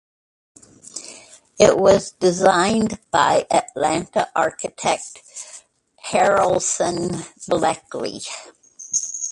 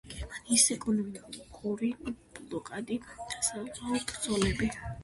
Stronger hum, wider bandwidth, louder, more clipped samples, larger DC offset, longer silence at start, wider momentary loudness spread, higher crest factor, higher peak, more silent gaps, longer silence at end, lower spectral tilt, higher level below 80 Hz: neither; about the same, 11.5 kHz vs 12 kHz; first, -19 LUFS vs -31 LUFS; neither; neither; first, 0.95 s vs 0.05 s; about the same, 19 LU vs 17 LU; about the same, 20 dB vs 22 dB; first, 0 dBFS vs -10 dBFS; neither; about the same, 0 s vs 0 s; about the same, -3.5 dB/octave vs -3 dB/octave; about the same, -52 dBFS vs -50 dBFS